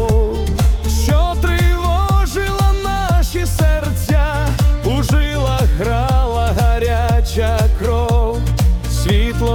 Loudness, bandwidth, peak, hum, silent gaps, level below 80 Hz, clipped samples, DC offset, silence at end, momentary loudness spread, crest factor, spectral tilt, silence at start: -16 LUFS; 18 kHz; -4 dBFS; none; none; -16 dBFS; under 0.1%; under 0.1%; 0 s; 2 LU; 10 dB; -6 dB/octave; 0 s